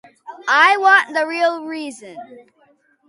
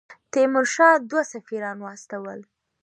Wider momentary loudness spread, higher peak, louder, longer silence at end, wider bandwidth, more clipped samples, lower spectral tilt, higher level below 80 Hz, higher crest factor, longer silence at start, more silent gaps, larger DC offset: about the same, 20 LU vs 19 LU; first, 0 dBFS vs -4 dBFS; first, -15 LUFS vs -21 LUFS; first, 0.7 s vs 0.4 s; about the same, 11.5 kHz vs 11 kHz; neither; second, -1 dB/octave vs -3.5 dB/octave; about the same, -80 dBFS vs -82 dBFS; about the same, 18 dB vs 20 dB; first, 0.25 s vs 0.1 s; neither; neither